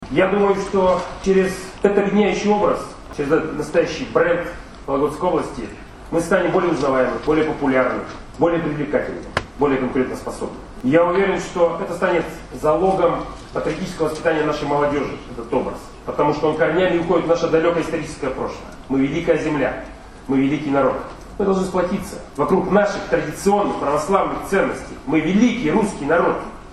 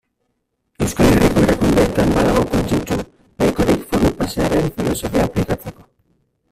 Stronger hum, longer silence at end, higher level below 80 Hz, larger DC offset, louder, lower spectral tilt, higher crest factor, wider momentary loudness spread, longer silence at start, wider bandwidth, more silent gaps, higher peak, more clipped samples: neither; second, 0 s vs 0.8 s; second, -40 dBFS vs -30 dBFS; neither; second, -20 LUFS vs -17 LUFS; about the same, -6 dB/octave vs -6 dB/octave; about the same, 18 dB vs 16 dB; about the same, 11 LU vs 10 LU; second, 0 s vs 0.8 s; second, 12.5 kHz vs 16 kHz; neither; about the same, 0 dBFS vs -2 dBFS; neither